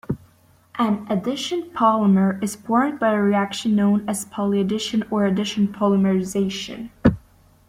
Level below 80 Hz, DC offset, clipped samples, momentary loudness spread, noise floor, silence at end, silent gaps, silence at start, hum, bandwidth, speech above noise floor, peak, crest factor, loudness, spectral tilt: -48 dBFS; under 0.1%; under 0.1%; 9 LU; -55 dBFS; 0.5 s; none; 0.1 s; none; 15 kHz; 35 dB; -4 dBFS; 18 dB; -21 LUFS; -6 dB/octave